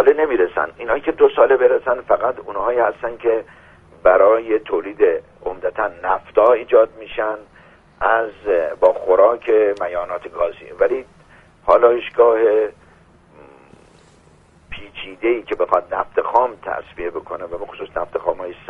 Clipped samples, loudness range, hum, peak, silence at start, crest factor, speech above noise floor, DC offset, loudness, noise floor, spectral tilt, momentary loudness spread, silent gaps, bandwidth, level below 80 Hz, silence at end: under 0.1%; 5 LU; none; 0 dBFS; 0 s; 18 dB; 33 dB; under 0.1%; -18 LUFS; -50 dBFS; -6.5 dB/octave; 14 LU; none; 4.3 kHz; -50 dBFS; 0.15 s